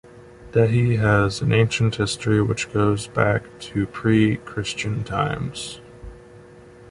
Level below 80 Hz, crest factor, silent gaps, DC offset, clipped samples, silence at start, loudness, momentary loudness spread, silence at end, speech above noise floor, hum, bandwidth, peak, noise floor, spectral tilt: -44 dBFS; 18 dB; none; under 0.1%; under 0.1%; 0.05 s; -21 LUFS; 10 LU; 0 s; 25 dB; none; 11.5 kHz; -4 dBFS; -45 dBFS; -6 dB/octave